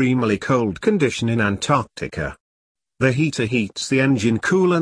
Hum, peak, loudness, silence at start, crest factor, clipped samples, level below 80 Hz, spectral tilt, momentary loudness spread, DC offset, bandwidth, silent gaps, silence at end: none; -4 dBFS; -20 LUFS; 0 s; 16 dB; under 0.1%; -48 dBFS; -6 dB/octave; 9 LU; under 0.1%; 10.5 kHz; 2.40-2.75 s; 0 s